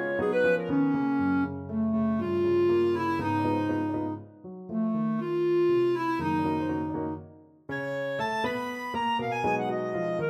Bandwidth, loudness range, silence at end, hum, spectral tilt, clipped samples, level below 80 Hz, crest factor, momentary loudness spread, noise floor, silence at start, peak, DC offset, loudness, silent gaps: 12 kHz; 4 LU; 0 s; none; -7.5 dB/octave; under 0.1%; -62 dBFS; 14 dB; 9 LU; -50 dBFS; 0 s; -14 dBFS; under 0.1%; -28 LUFS; none